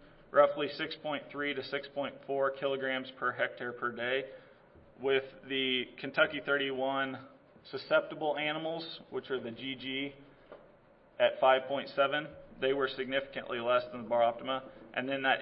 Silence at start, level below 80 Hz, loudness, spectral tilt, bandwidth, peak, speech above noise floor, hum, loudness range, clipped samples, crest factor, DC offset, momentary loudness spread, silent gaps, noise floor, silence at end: 0 s; -70 dBFS; -33 LUFS; -7.5 dB/octave; 5.8 kHz; -12 dBFS; 29 dB; none; 4 LU; under 0.1%; 22 dB; under 0.1%; 10 LU; none; -61 dBFS; 0 s